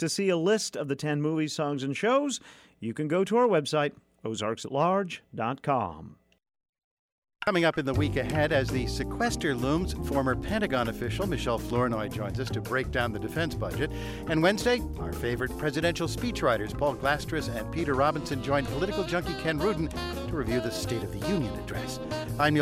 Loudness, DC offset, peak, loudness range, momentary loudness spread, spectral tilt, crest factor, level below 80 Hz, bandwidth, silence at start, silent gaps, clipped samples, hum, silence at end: -29 LUFS; under 0.1%; -12 dBFS; 3 LU; 7 LU; -5.5 dB/octave; 16 dB; -44 dBFS; 16 kHz; 0 s; 6.69-7.22 s; under 0.1%; none; 0 s